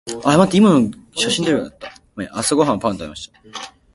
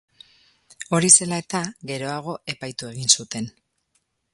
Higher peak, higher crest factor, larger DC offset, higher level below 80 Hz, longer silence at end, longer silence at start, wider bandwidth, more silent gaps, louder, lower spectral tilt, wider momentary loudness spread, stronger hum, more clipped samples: about the same, 0 dBFS vs 0 dBFS; second, 18 dB vs 24 dB; neither; first, -50 dBFS vs -64 dBFS; second, 0.25 s vs 0.85 s; second, 0.05 s vs 0.8 s; about the same, 11.5 kHz vs 11.5 kHz; neither; first, -16 LUFS vs -20 LUFS; first, -5 dB/octave vs -2.5 dB/octave; about the same, 20 LU vs 18 LU; neither; neither